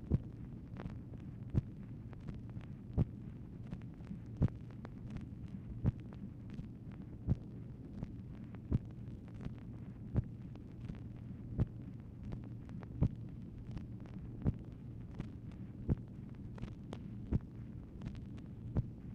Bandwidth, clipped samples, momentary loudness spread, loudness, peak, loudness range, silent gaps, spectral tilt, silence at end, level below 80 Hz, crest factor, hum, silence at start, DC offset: 6.4 kHz; under 0.1%; 11 LU; -44 LUFS; -20 dBFS; 2 LU; none; -10 dB/octave; 0 s; -50 dBFS; 22 dB; none; 0 s; under 0.1%